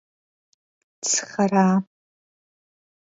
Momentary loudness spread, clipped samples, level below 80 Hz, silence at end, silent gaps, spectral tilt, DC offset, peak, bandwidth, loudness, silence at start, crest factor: 10 LU; under 0.1%; -72 dBFS; 1.3 s; none; -4.5 dB/octave; under 0.1%; -6 dBFS; 8 kHz; -21 LUFS; 1.05 s; 20 dB